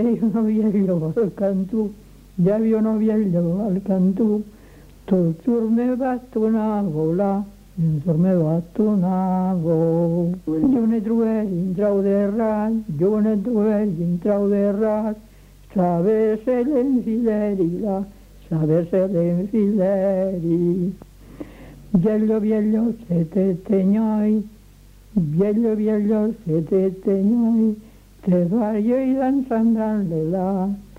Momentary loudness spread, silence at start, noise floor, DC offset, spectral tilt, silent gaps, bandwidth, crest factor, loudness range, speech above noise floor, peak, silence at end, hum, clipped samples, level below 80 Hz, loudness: 6 LU; 0 s; -47 dBFS; under 0.1%; -10.5 dB/octave; none; 5.6 kHz; 14 dB; 1 LU; 27 dB; -6 dBFS; 0.15 s; none; under 0.1%; -48 dBFS; -20 LUFS